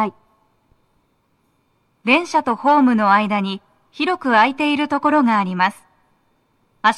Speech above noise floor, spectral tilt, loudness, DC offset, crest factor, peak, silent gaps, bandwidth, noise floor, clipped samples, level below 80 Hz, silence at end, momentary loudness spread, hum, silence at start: 47 dB; -5.5 dB/octave; -17 LUFS; under 0.1%; 18 dB; -2 dBFS; none; 11.5 kHz; -64 dBFS; under 0.1%; -66 dBFS; 0 s; 9 LU; none; 0 s